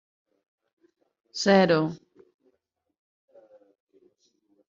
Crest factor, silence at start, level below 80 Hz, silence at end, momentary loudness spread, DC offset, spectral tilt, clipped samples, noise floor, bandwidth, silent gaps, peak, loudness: 24 dB; 1.35 s; -70 dBFS; 2.7 s; 21 LU; under 0.1%; -4.5 dB/octave; under 0.1%; -76 dBFS; 7.4 kHz; none; -6 dBFS; -22 LUFS